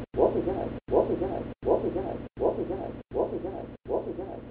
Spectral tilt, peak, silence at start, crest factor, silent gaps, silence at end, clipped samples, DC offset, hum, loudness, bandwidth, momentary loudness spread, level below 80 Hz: -8 dB/octave; -10 dBFS; 0 s; 20 dB; none; 0 s; under 0.1%; under 0.1%; none; -30 LUFS; 4.6 kHz; 10 LU; -48 dBFS